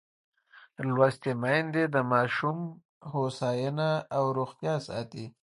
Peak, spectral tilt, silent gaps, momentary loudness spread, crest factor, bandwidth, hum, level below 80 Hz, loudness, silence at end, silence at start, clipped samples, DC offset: -8 dBFS; -7 dB/octave; 2.85-3.01 s; 11 LU; 22 dB; 11.5 kHz; none; -70 dBFS; -29 LUFS; 0.15 s; 0.55 s; under 0.1%; under 0.1%